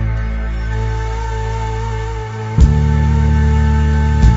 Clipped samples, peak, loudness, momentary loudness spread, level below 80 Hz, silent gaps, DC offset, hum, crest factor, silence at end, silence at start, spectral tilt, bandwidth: under 0.1%; 0 dBFS; -16 LUFS; 9 LU; -16 dBFS; none; under 0.1%; none; 14 dB; 0 s; 0 s; -7.5 dB/octave; 7.8 kHz